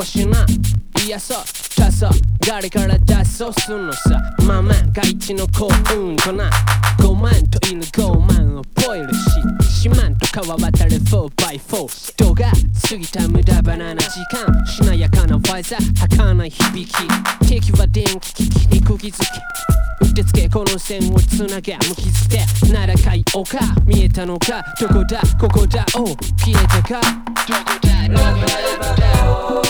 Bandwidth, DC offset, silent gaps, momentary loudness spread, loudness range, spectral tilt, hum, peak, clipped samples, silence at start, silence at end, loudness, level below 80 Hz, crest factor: over 20 kHz; under 0.1%; none; 6 LU; 1 LU; -5 dB/octave; none; 0 dBFS; under 0.1%; 0 s; 0 s; -16 LUFS; -18 dBFS; 14 dB